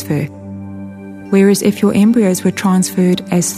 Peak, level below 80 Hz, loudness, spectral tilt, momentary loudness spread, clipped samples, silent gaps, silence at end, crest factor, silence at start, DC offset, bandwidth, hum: 0 dBFS; -54 dBFS; -13 LUFS; -5.5 dB/octave; 18 LU; under 0.1%; none; 0 s; 14 dB; 0 s; under 0.1%; 15.5 kHz; none